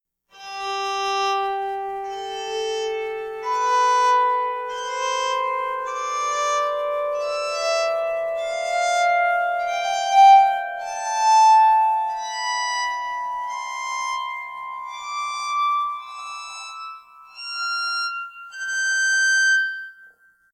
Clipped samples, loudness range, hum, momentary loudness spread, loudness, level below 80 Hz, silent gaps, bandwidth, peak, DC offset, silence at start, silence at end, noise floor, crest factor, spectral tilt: under 0.1%; 10 LU; 60 Hz at -65 dBFS; 16 LU; -21 LUFS; -64 dBFS; none; 16 kHz; -4 dBFS; under 0.1%; 0.35 s; 0.45 s; -53 dBFS; 18 dB; 1.5 dB/octave